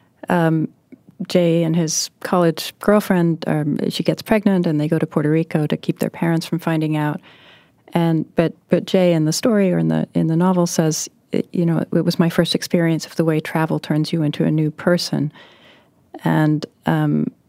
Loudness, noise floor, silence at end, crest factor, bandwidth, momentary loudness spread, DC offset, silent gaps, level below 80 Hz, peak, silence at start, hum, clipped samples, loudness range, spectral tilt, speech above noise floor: -19 LUFS; -51 dBFS; 0.2 s; 16 dB; 16 kHz; 6 LU; under 0.1%; none; -56 dBFS; -2 dBFS; 0.3 s; none; under 0.1%; 3 LU; -6 dB/octave; 33 dB